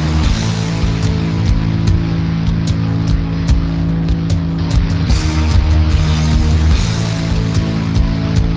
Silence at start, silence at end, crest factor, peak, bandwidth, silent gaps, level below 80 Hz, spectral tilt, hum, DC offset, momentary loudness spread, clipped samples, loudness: 0 s; 0 s; 12 dB; 0 dBFS; 8 kHz; none; -18 dBFS; -6.5 dB/octave; none; under 0.1%; 3 LU; under 0.1%; -15 LUFS